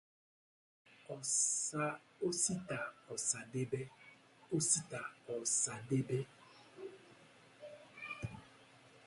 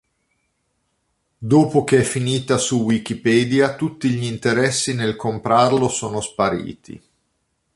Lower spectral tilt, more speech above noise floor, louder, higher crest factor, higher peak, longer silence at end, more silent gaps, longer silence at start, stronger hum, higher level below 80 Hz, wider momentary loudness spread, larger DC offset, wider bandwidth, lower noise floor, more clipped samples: second, -3.5 dB/octave vs -5 dB/octave; second, 24 dB vs 52 dB; second, -38 LUFS vs -19 LUFS; first, 24 dB vs 18 dB; second, -18 dBFS vs -2 dBFS; second, 0.05 s vs 0.8 s; neither; second, 0.9 s vs 1.4 s; neither; second, -74 dBFS vs -52 dBFS; first, 20 LU vs 8 LU; neither; about the same, 11.5 kHz vs 11.5 kHz; second, -63 dBFS vs -70 dBFS; neither